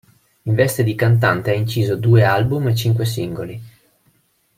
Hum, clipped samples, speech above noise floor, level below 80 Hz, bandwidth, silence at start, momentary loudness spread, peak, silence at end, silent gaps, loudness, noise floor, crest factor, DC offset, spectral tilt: none; under 0.1%; 44 dB; -50 dBFS; 16 kHz; 0.45 s; 14 LU; -2 dBFS; 0.9 s; none; -17 LUFS; -61 dBFS; 16 dB; under 0.1%; -6.5 dB/octave